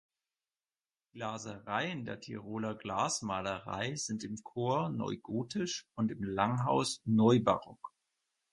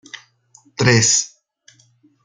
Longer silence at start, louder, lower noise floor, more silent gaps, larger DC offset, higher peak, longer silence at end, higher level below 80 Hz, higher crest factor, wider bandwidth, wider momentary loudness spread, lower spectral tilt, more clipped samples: first, 1.15 s vs 0.8 s; second, -34 LUFS vs -15 LUFS; first, under -90 dBFS vs -56 dBFS; neither; neither; second, -12 dBFS vs -2 dBFS; second, 0.65 s vs 0.95 s; second, -66 dBFS vs -56 dBFS; about the same, 22 dB vs 20 dB; first, 11.5 kHz vs 9.8 kHz; second, 13 LU vs 25 LU; first, -5 dB/octave vs -3 dB/octave; neither